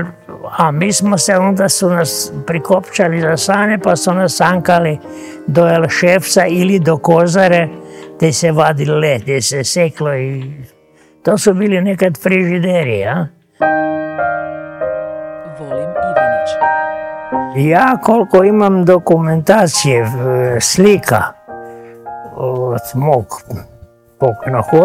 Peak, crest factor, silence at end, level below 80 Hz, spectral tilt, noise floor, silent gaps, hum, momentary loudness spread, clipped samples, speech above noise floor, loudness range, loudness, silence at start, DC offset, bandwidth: 0 dBFS; 14 dB; 0 s; -50 dBFS; -5 dB/octave; -48 dBFS; none; none; 15 LU; 0.4%; 36 dB; 6 LU; -13 LUFS; 0 s; under 0.1%; 16.5 kHz